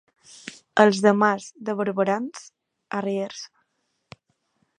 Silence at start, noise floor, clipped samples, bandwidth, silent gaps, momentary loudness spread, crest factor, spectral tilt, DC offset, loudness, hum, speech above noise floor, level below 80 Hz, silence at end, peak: 0.45 s; -73 dBFS; under 0.1%; 10.5 kHz; none; 23 LU; 24 dB; -5.5 dB/octave; under 0.1%; -23 LUFS; none; 52 dB; -74 dBFS; 1.3 s; 0 dBFS